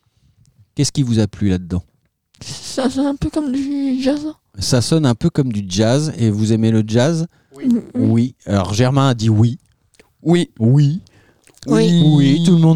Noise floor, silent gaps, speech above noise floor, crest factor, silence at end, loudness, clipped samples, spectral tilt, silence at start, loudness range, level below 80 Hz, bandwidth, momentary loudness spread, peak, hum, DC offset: -59 dBFS; none; 44 dB; 14 dB; 0 s; -16 LUFS; under 0.1%; -6.5 dB/octave; 0.75 s; 4 LU; -44 dBFS; 13 kHz; 13 LU; -2 dBFS; none; 0.4%